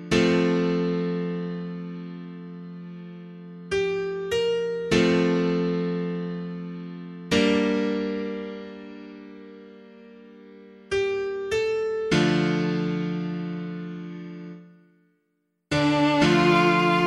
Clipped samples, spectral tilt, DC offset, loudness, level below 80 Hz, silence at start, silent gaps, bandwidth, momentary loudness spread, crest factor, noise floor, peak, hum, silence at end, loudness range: under 0.1%; -6 dB/octave; under 0.1%; -24 LUFS; -54 dBFS; 0 s; none; 11.5 kHz; 20 LU; 20 dB; -74 dBFS; -6 dBFS; none; 0 s; 7 LU